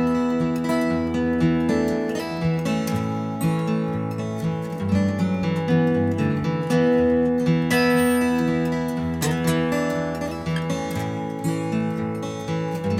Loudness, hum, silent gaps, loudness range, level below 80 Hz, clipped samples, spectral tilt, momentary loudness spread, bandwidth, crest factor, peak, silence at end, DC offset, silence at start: -23 LUFS; none; none; 4 LU; -46 dBFS; under 0.1%; -6.5 dB/octave; 8 LU; 16 kHz; 14 dB; -8 dBFS; 0 s; under 0.1%; 0 s